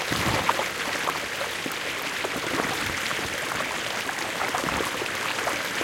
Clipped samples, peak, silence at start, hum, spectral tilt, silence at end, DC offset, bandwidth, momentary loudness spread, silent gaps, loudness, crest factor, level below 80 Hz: under 0.1%; -6 dBFS; 0 s; none; -2.5 dB/octave; 0 s; under 0.1%; 17 kHz; 4 LU; none; -26 LUFS; 22 dB; -52 dBFS